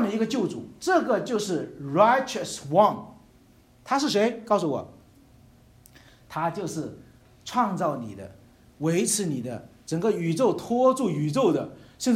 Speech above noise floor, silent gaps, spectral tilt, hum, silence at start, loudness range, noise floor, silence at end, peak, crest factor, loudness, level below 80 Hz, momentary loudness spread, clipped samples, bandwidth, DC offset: 32 dB; none; -5 dB/octave; none; 0 s; 7 LU; -56 dBFS; 0 s; -4 dBFS; 22 dB; -25 LUFS; -62 dBFS; 16 LU; under 0.1%; 16 kHz; under 0.1%